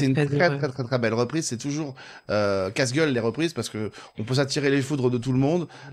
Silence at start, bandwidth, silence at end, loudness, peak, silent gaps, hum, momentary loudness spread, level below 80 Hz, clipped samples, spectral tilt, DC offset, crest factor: 0 s; 13.5 kHz; 0 s; -25 LUFS; -6 dBFS; none; none; 9 LU; -60 dBFS; under 0.1%; -5.5 dB/octave; under 0.1%; 18 dB